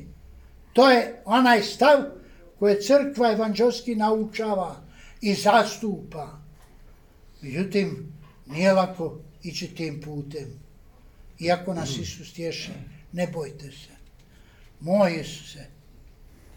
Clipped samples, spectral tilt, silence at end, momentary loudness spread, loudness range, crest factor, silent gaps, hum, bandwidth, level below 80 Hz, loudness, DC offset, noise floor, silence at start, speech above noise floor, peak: under 0.1%; -5 dB/octave; 0.95 s; 20 LU; 11 LU; 20 dB; none; none; 19 kHz; -52 dBFS; -23 LUFS; under 0.1%; -52 dBFS; 0 s; 29 dB; -4 dBFS